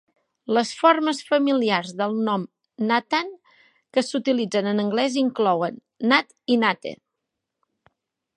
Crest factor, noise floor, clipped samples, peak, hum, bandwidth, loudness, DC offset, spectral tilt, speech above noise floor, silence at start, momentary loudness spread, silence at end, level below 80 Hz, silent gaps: 22 dB; -82 dBFS; under 0.1%; -2 dBFS; none; 11 kHz; -22 LUFS; under 0.1%; -4.5 dB/octave; 60 dB; 0.5 s; 9 LU; 1.4 s; -76 dBFS; none